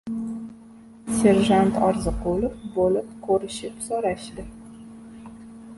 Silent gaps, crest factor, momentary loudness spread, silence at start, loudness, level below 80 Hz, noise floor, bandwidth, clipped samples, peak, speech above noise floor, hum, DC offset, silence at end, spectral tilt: none; 20 dB; 24 LU; 0.05 s; -23 LUFS; -42 dBFS; -46 dBFS; 12 kHz; under 0.1%; -4 dBFS; 24 dB; none; under 0.1%; 0 s; -6 dB/octave